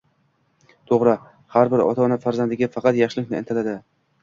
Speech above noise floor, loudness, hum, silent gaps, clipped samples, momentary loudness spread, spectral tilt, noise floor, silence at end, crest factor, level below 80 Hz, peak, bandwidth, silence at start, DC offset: 45 dB; -21 LUFS; none; none; under 0.1%; 8 LU; -7.5 dB/octave; -65 dBFS; 0.45 s; 18 dB; -62 dBFS; -2 dBFS; 7.4 kHz; 0.9 s; under 0.1%